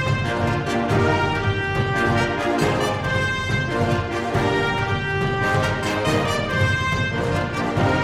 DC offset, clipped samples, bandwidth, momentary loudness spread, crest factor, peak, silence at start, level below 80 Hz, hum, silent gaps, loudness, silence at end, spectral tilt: under 0.1%; under 0.1%; 15 kHz; 3 LU; 14 dB; -6 dBFS; 0 s; -38 dBFS; none; none; -21 LUFS; 0 s; -5.5 dB/octave